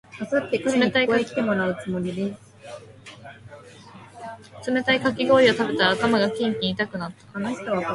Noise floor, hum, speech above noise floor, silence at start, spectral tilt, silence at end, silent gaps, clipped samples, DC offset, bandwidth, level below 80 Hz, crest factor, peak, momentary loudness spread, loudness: -45 dBFS; none; 23 dB; 0.1 s; -5 dB/octave; 0 s; none; under 0.1%; under 0.1%; 11.5 kHz; -60 dBFS; 20 dB; -4 dBFS; 22 LU; -22 LUFS